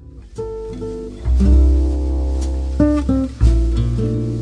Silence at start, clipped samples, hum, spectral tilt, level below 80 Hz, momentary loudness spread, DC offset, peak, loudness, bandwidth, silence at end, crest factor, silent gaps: 0 s; under 0.1%; none; -9 dB/octave; -18 dBFS; 14 LU; under 0.1%; -2 dBFS; -18 LUFS; 9 kHz; 0 s; 14 dB; none